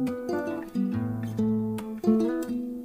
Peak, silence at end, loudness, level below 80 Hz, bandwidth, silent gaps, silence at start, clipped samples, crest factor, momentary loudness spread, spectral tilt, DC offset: -12 dBFS; 0 s; -28 LUFS; -60 dBFS; 16 kHz; none; 0 s; under 0.1%; 16 dB; 7 LU; -8 dB/octave; under 0.1%